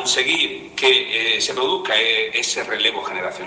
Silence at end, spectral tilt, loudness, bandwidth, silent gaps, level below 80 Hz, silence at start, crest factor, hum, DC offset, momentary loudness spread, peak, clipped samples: 0 s; -0.5 dB/octave; -18 LUFS; 10 kHz; none; -62 dBFS; 0 s; 20 dB; none; under 0.1%; 6 LU; -2 dBFS; under 0.1%